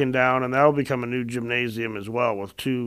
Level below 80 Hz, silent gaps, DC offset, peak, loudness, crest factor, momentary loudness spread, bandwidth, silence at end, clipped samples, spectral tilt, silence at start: -58 dBFS; none; under 0.1%; -4 dBFS; -23 LUFS; 20 dB; 8 LU; 15.5 kHz; 0 s; under 0.1%; -6.5 dB/octave; 0 s